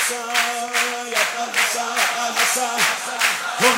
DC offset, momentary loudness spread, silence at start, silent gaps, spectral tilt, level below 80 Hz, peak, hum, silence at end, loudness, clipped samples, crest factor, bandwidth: under 0.1%; 2 LU; 0 s; none; 0.5 dB/octave; -72 dBFS; -2 dBFS; none; 0 s; -19 LUFS; under 0.1%; 18 dB; 16 kHz